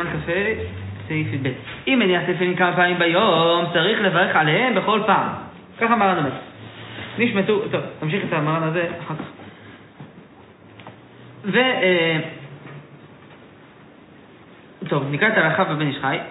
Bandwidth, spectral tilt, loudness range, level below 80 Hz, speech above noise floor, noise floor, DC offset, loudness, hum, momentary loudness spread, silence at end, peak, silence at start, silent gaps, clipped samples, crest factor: 4.1 kHz; -9 dB/octave; 9 LU; -56 dBFS; 26 dB; -46 dBFS; under 0.1%; -20 LUFS; none; 18 LU; 0 s; -4 dBFS; 0 s; none; under 0.1%; 18 dB